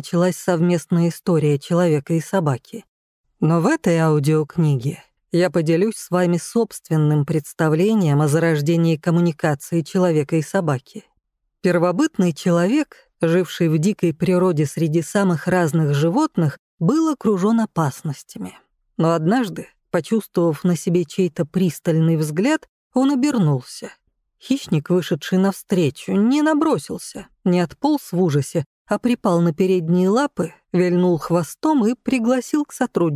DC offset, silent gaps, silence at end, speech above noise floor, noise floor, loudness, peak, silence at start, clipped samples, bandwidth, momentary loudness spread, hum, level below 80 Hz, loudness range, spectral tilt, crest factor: under 0.1%; 2.88-3.24 s, 16.59-16.78 s, 22.69-22.91 s, 28.66-28.85 s; 0 s; 54 dB; -73 dBFS; -19 LUFS; -6 dBFS; 0.05 s; under 0.1%; 15.5 kHz; 7 LU; none; -60 dBFS; 2 LU; -7 dB/octave; 12 dB